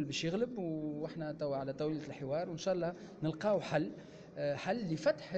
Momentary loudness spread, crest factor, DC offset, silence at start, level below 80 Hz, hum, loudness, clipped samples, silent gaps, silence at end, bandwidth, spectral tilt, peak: 7 LU; 16 dB; under 0.1%; 0 s; -70 dBFS; none; -37 LUFS; under 0.1%; none; 0 s; 8.4 kHz; -6 dB/octave; -20 dBFS